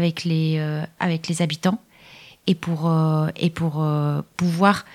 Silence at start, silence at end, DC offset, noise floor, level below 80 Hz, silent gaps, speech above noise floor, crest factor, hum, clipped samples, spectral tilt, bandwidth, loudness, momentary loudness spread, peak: 0 s; 0 s; under 0.1%; -47 dBFS; -60 dBFS; none; 26 dB; 20 dB; none; under 0.1%; -6.5 dB/octave; 13.5 kHz; -22 LUFS; 6 LU; -2 dBFS